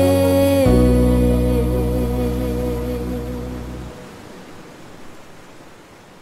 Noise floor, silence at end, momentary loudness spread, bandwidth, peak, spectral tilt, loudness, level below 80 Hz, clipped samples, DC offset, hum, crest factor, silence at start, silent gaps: -43 dBFS; 0.45 s; 24 LU; 16 kHz; -2 dBFS; -7.5 dB/octave; -18 LUFS; -26 dBFS; under 0.1%; under 0.1%; none; 16 dB; 0 s; none